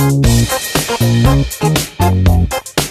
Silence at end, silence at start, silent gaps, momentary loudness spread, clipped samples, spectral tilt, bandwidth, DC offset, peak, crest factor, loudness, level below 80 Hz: 0 s; 0 s; none; 4 LU; under 0.1%; -5 dB/octave; 14 kHz; under 0.1%; 0 dBFS; 12 dB; -13 LUFS; -22 dBFS